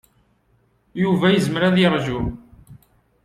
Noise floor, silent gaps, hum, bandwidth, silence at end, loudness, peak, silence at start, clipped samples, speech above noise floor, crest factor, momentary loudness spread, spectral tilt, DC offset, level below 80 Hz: -62 dBFS; none; none; 12.5 kHz; 0.5 s; -19 LUFS; -4 dBFS; 0.95 s; under 0.1%; 44 dB; 18 dB; 14 LU; -6.5 dB/octave; under 0.1%; -44 dBFS